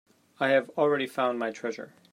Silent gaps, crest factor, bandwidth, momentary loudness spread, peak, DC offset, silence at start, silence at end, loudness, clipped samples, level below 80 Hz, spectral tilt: none; 18 dB; 15.5 kHz; 11 LU; -10 dBFS; under 0.1%; 0.4 s; 0.25 s; -28 LUFS; under 0.1%; -82 dBFS; -5 dB/octave